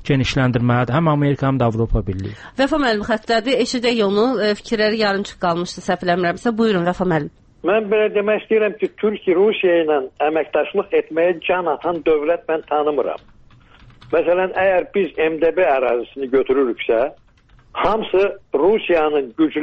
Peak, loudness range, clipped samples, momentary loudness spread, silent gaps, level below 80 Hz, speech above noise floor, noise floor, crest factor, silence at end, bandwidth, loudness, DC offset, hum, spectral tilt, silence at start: -4 dBFS; 2 LU; under 0.1%; 5 LU; none; -40 dBFS; 33 dB; -50 dBFS; 14 dB; 0 s; 8.4 kHz; -18 LUFS; under 0.1%; none; -6.5 dB/octave; 0 s